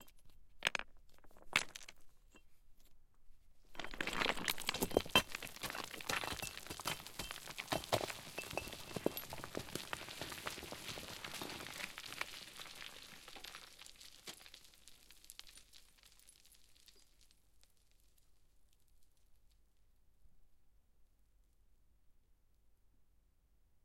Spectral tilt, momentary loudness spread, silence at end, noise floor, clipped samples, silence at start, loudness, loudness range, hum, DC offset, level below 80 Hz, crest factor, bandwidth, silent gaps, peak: -2.5 dB/octave; 21 LU; 0.05 s; -71 dBFS; under 0.1%; 0 s; -42 LUFS; 18 LU; none; under 0.1%; -64 dBFS; 34 dB; 16.5 kHz; none; -14 dBFS